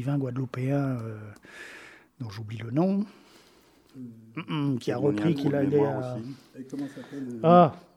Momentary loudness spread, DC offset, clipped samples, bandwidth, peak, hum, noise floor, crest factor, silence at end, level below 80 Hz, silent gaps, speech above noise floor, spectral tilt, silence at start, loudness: 22 LU; under 0.1%; under 0.1%; 12.5 kHz; -6 dBFS; none; -59 dBFS; 22 dB; 0.15 s; -68 dBFS; none; 32 dB; -8.5 dB/octave; 0 s; -27 LUFS